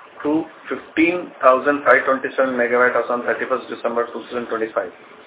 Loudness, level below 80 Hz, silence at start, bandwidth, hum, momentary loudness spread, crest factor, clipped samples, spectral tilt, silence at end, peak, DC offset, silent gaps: -19 LUFS; -64 dBFS; 0 s; 4 kHz; none; 11 LU; 20 dB; under 0.1%; -8.5 dB/octave; 0.05 s; 0 dBFS; under 0.1%; none